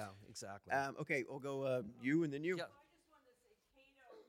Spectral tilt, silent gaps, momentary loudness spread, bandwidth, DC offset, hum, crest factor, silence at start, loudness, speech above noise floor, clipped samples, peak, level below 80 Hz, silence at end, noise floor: -6 dB/octave; none; 13 LU; 16.5 kHz; under 0.1%; none; 20 dB; 0 s; -41 LUFS; 33 dB; under 0.1%; -24 dBFS; -82 dBFS; 0.05 s; -74 dBFS